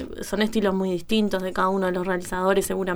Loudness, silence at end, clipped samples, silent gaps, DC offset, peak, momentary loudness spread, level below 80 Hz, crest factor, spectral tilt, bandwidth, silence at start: -24 LUFS; 0 s; under 0.1%; none; under 0.1%; -8 dBFS; 4 LU; -46 dBFS; 16 dB; -5 dB/octave; 19.5 kHz; 0 s